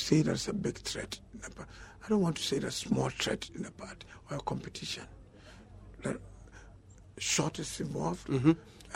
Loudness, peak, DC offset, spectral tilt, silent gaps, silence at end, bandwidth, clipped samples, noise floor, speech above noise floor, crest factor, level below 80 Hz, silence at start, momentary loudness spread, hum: -34 LUFS; -12 dBFS; under 0.1%; -4.5 dB/octave; none; 0 s; 16 kHz; under 0.1%; -55 dBFS; 21 dB; 22 dB; -56 dBFS; 0 s; 25 LU; none